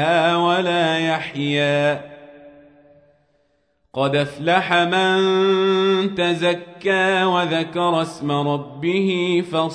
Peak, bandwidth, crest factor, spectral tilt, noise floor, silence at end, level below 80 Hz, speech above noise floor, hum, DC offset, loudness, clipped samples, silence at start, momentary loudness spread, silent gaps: -4 dBFS; 10.5 kHz; 16 dB; -5.5 dB/octave; -65 dBFS; 0 s; -64 dBFS; 47 dB; none; under 0.1%; -19 LUFS; under 0.1%; 0 s; 6 LU; none